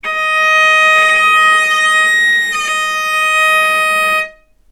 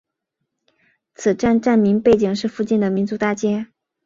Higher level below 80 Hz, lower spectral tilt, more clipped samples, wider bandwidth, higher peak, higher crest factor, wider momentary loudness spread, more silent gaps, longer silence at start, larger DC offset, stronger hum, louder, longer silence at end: about the same, -52 dBFS vs -52 dBFS; second, 1 dB/octave vs -6.5 dB/octave; neither; first, 18 kHz vs 7.6 kHz; first, 0 dBFS vs -4 dBFS; about the same, 12 dB vs 16 dB; about the same, 7 LU vs 8 LU; neither; second, 0.05 s vs 1.2 s; neither; neither; first, -10 LUFS vs -18 LUFS; about the same, 0.4 s vs 0.4 s